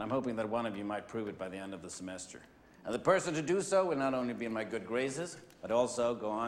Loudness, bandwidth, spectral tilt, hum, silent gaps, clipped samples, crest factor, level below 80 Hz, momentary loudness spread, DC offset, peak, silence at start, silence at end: -35 LUFS; 13 kHz; -5 dB/octave; none; none; under 0.1%; 20 dB; -70 dBFS; 14 LU; under 0.1%; -14 dBFS; 0 s; 0 s